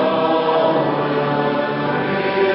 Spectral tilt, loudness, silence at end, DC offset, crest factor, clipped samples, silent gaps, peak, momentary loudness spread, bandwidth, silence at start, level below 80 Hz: -11 dB/octave; -18 LUFS; 0 s; under 0.1%; 12 dB; under 0.1%; none; -6 dBFS; 4 LU; 5.8 kHz; 0 s; -58 dBFS